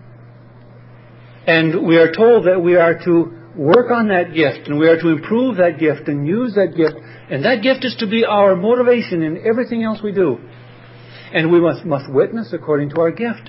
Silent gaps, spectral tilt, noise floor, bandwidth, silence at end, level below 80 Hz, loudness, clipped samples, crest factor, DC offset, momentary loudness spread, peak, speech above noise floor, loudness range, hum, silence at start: none; -11.5 dB/octave; -41 dBFS; 5.8 kHz; 0 s; -60 dBFS; -15 LUFS; under 0.1%; 16 dB; under 0.1%; 8 LU; 0 dBFS; 26 dB; 5 LU; none; 1.45 s